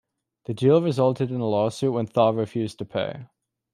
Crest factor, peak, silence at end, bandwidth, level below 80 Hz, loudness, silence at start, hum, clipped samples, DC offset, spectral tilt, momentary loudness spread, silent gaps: 18 dB; -6 dBFS; 0.5 s; 12.5 kHz; -66 dBFS; -23 LUFS; 0.5 s; none; under 0.1%; under 0.1%; -7.5 dB/octave; 13 LU; none